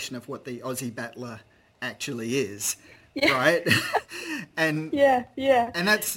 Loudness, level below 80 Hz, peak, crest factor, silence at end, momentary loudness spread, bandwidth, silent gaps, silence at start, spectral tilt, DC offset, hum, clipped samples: -25 LUFS; -64 dBFS; -4 dBFS; 22 dB; 0 s; 15 LU; 17 kHz; none; 0 s; -3.5 dB/octave; under 0.1%; none; under 0.1%